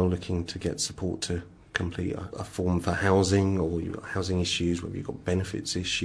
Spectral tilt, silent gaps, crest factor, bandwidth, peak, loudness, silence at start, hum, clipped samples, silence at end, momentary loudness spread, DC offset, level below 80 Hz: -5 dB/octave; none; 22 dB; 11 kHz; -6 dBFS; -29 LUFS; 0 s; none; under 0.1%; 0 s; 10 LU; under 0.1%; -48 dBFS